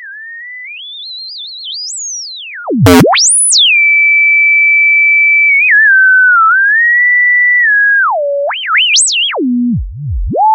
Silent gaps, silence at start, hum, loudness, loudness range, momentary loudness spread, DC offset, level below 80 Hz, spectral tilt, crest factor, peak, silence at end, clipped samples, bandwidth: none; 0 s; none; -6 LUFS; 5 LU; 18 LU; under 0.1%; -32 dBFS; -2 dB/octave; 10 dB; 0 dBFS; 0 s; 0.1%; 15.5 kHz